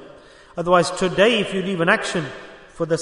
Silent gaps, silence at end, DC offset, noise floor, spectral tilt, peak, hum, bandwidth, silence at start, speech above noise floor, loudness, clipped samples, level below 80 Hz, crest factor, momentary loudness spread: none; 0 s; under 0.1%; -45 dBFS; -4.5 dB/octave; -2 dBFS; none; 11 kHz; 0 s; 26 dB; -19 LUFS; under 0.1%; -52 dBFS; 18 dB; 15 LU